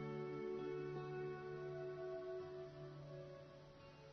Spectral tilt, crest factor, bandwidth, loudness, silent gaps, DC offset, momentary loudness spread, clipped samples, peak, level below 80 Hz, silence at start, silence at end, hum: -6.5 dB/octave; 12 dB; 6.4 kHz; -49 LUFS; none; under 0.1%; 12 LU; under 0.1%; -38 dBFS; -76 dBFS; 0 s; 0 s; none